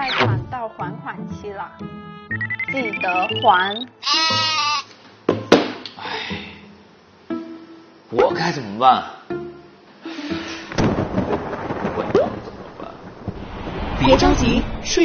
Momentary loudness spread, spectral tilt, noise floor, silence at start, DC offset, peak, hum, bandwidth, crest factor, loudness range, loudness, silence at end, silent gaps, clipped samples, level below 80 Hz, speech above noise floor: 18 LU; -3 dB/octave; -48 dBFS; 0 s; under 0.1%; 0 dBFS; none; 7 kHz; 22 dB; 5 LU; -20 LUFS; 0 s; none; under 0.1%; -36 dBFS; 29 dB